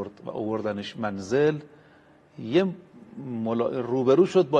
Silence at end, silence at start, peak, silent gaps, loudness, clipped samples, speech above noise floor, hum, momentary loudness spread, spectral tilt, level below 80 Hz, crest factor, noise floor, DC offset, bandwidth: 0 s; 0 s; -8 dBFS; none; -26 LUFS; under 0.1%; 31 dB; none; 17 LU; -7 dB/octave; -66 dBFS; 18 dB; -56 dBFS; under 0.1%; 9 kHz